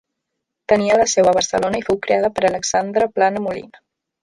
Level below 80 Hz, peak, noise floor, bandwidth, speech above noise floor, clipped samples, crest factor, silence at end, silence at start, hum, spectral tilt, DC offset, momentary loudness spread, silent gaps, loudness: -52 dBFS; -2 dBFS; -78 dBFS; 11.5 kHz; 61 dB; under 0.1%; 16 dB; 0.55 s; 0.7 s; none; -3.5 dB/octave; under 0.1%; 9 LU; none; -17 LUFS